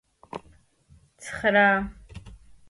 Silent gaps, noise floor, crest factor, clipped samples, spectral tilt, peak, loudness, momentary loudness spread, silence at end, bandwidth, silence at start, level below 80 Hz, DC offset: none; -58 dBFS; 20 dB; under 0.1%; -5 dB/octave; -8 dBFS; -22 LUFS; 26 LU; 0.35 s; 11.5 kHz; 0.35 s; -50 dBFS; under 0.1%